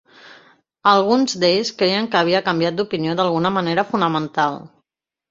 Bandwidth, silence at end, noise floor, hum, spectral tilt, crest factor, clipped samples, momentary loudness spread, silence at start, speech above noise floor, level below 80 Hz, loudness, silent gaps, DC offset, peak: 7.8 kHz; 0.65 s; -78 dBFS; none; -5 dB/octave; 18 dB; under 0.1%; 6 LU; 0.25 s; 60 dB; -62 dBFS; -18 LUFS; none; under 0.1%; -2 dBFS